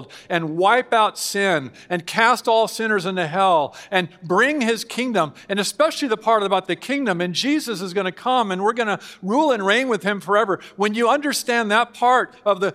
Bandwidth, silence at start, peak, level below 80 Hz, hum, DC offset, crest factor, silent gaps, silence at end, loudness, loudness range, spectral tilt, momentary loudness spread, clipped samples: 16 kHz; 0 s; 0 dBFS; -70 dBFS; none; under 0.1%; 20 dB; none; 0 s; -20 LUFS; 2 LU; -4 dB/octave; 6 LU; under 0.1%